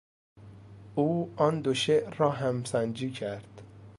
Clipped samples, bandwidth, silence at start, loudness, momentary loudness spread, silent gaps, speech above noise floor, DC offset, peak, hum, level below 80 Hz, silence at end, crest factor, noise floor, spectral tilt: under 0.1%; 11.5 kHz; 0.35 s; -29 LUFS; 12 LU; none; 21 dB; under 0.1%; -10 dBFS; none; -64 dBFS; 0 s; 20 dB; -49 dBFS; -6 dB/octave